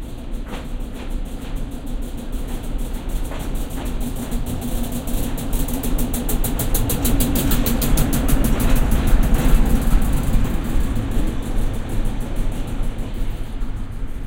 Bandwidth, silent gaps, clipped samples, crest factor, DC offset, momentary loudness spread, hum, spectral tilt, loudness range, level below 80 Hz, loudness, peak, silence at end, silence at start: 17 kHz; none; under 0.1%; 16 dB; under 0.1%; 12 LU; none; -5.5 dB/octave; 10 LU; -20 dBFS; -24 LUFS; -2 dBFS; 0 s; 0 s